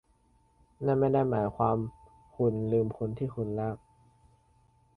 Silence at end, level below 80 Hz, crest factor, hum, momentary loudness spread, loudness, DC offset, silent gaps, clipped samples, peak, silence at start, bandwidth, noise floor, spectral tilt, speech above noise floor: 1.2 s; -58 dBFS; 18 dB; none; 9 LU; -30 LUFS; under 0.1%; none; under 0.1%; -12 dBFS; 0.8 s; 4.7 kHz; -67 dBFS; -11 dB/octave; 38 dB